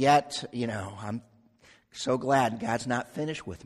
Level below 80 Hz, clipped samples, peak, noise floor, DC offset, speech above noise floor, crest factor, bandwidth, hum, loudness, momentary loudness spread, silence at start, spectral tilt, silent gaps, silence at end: -62 dBFS; under 0.1%; -8 dBFS; -60 dBFS; under 0.1%; 32 dB; 20 dB; 12.5 kHz; none; -30 LUFS; 13 LU; 0 s; -5 dB/octave; none; 0.1 s